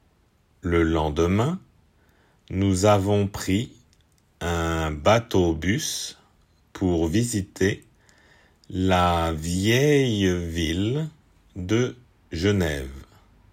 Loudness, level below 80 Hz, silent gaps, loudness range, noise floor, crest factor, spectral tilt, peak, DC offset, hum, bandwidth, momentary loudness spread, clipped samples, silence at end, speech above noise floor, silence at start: -23 LUFS; -44 dBFS; none; 3 LU; -62 dBFS; 18 dB; -5.5 dB/octave; -6 dBFS; under 0.1%; none; 16 kHz; 14 LU; under 0.1%; 0.5 s; 40 dB; 0.65 s